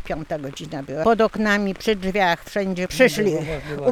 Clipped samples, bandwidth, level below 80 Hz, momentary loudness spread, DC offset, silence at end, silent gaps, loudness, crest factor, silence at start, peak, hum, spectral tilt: under 0.1%; 19 kHz; -44 dBFS; 12 LU; under 0.1%; 0 s; none; -21 LUFS; 18 dB; 0 s; -4 dBFS; none; -5 dB/octave